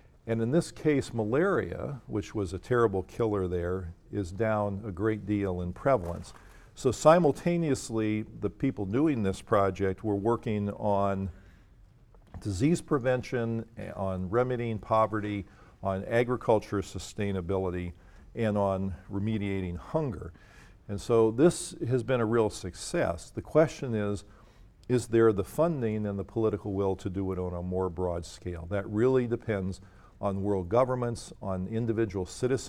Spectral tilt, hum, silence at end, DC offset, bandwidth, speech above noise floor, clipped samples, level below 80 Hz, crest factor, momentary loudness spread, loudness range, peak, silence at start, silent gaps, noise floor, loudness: -7 dB/octave; none; 0 s; under 0.1%; 15 kHz; 28 dB; under 0.1%; -52 dBFS; 22 dB; 11 LU; 4 LU; -6 dBFS; 0.25 s; none; -57 dBFS; -30 LUFS